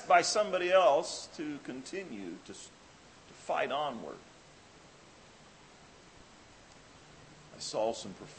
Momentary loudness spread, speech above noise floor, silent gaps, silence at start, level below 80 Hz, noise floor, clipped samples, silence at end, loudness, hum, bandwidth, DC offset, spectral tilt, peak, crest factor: 26 LU; 25 dB; none; 0 s; -70 dBFS; -57 dBFS; under 0.1%; 0 s; -32 LUFS; none; 8.8 kHz; under 0.1%; -2.5 dB/octave; -10 dBFS; 26 dB